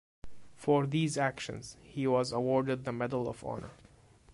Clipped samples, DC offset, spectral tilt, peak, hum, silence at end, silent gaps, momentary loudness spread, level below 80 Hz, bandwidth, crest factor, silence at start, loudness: under 0.1%; under 0.1%; -6 dB/octave; -16 dBFS; none; 0 s; none; 13 LU; -62 dBFS; 11.5 kHz; 18 dB; 0.25 s; -33 LUFS